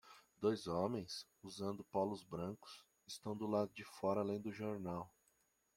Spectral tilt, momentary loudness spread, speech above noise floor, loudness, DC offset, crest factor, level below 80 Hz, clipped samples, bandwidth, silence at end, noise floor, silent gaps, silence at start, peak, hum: -6 dB/octave; 14 LU; 37 dB; -43 LUFS; under 0.1%; 20 dB; -78 dBFS; under 0.1%; 16.5 kHz; 0.7 s; -79 dBFS; none; 0.05 s; -24 dBFS; none